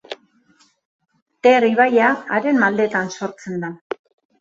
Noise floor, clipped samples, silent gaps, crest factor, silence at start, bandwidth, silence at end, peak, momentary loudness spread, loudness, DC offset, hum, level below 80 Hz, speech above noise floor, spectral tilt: -58 dBFS; under 0.1%; 0.85-0.99 s, 1.22-1.26 s; 18 dB; 0.1 s; 7.8 kHz; 0.65 s; -2 dBFS; 19 LU; -18 LUFS; under 0.1%; none; -66 dBFS; 41 dB; -5.5 dB/octave